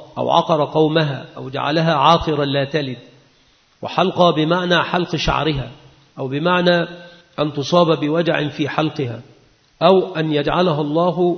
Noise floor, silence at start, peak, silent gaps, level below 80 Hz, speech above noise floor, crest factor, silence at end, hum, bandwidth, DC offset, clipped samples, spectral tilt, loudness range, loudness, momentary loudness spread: -56 dBFS; 0 s; 0 dBFS; none; -42 dBFS; 38 dB; 18 dB; 0 s; none; 6.6 kHz; under 0.1%; under 0.1%; -6.5 dB/octave; 2 LU; -18 LUFS; 14 LU